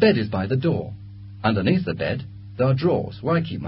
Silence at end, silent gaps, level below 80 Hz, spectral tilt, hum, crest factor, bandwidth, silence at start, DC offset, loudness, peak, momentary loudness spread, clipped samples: 0 s; none; -46 dBFS; -12 dB/octave; none; 18 dB; 5.8 kHz; 0 s; under 0.1%; -23 LUFS; -4 dBFS; 15 LU; under 0.1%